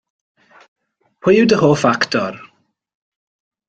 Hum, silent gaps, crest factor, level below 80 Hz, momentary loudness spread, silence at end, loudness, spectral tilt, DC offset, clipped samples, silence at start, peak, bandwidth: none; none; 18 dB; -56 dBFS; 12 LU; 1.3 s; -15 LUFS; -5.5 dB/octave; under 0.1%; under 0.1%; 1.25 s; -2 dBFS; 9 kHz